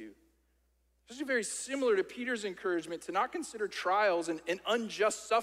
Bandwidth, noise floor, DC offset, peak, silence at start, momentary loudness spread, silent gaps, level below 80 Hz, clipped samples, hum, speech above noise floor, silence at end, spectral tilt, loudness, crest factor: 16 kHz; -73 dBFS; under 0.1%; -16 dBFS; 0 s; 8 LU; none; -74 dBFS; under 0.1%; none; 41 dB; 0 s; -2.5 dB/octave; -33 LUFS; 18 dB